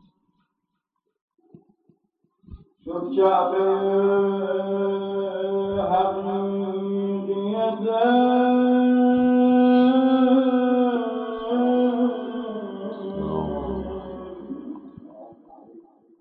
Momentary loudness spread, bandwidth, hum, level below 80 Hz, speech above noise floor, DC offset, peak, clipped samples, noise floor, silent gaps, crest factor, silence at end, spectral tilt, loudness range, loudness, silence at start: 15 LU; 4.1 kHz; none; -52 dBFS; 59 dB; under 0.1%; -8 dBFS; under 0.1%; -79 dBFS; none; 14 dB; 0.4 s; -10.5 dB/octave; 13 LU; -21 LUFS; 2.5 s